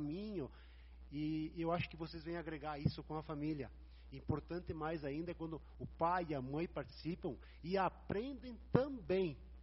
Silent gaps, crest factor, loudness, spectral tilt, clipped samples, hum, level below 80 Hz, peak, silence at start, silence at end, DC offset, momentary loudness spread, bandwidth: none; 28 dB; -43 LUFS; -6 dB/octave; under 0.1%; none; -58 dBFS; -14 dBFS; 0 s; 0 s; under 0.1%; 13 LU; 5.8 kHz